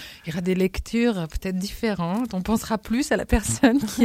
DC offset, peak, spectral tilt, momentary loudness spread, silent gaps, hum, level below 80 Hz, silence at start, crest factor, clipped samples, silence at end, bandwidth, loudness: under 0.1%; -4 dBFS; -5 dB/octave; 9 LU; none; none; -36 dBFS; 0 s; 20 dB; under 0.1%; 0 s; 16 kHz; -24 LUFS